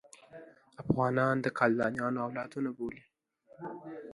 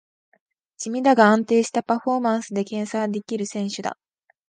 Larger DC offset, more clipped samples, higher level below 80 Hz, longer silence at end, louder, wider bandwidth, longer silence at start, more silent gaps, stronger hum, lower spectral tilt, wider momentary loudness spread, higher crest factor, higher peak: neither; neither; first, -66 dBFS vs -74 dBFS; second, 0 s vs 0.55 s; second, -32 LUFS vs -22 LUFS; first, 11.5 kHz vs 9.8 kHz; second, 0.3 s vs 0.8 s; neither; neither; first, -7.5 dB/octave vs -5 dB/octave; first, 24 LU vs 13 LU; about the same, 22 dB vs 20 dB; second, -12 dBFS vs -2 dBFS